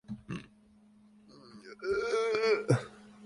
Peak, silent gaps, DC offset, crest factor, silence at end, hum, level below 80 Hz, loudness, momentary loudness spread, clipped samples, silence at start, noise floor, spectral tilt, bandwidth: -12 dBFS; none; under 0.1%; 22 dB; 0 s; none; -64 dBFS; -32 LUFS; 21 LU; under 0.1%; 0.1 s; -61 dBFS; -6 dB/octave; 11.5 kHz